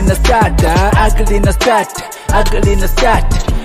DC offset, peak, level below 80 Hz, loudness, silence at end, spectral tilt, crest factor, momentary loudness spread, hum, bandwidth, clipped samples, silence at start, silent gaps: under 0.1%; 0 dBFS; -14 dBFS; -12 LUFS; 0 s; -5 dB/octave; 10 dB; 5 LU; none; 15.5 kHz; under 0.1%; 0 s; none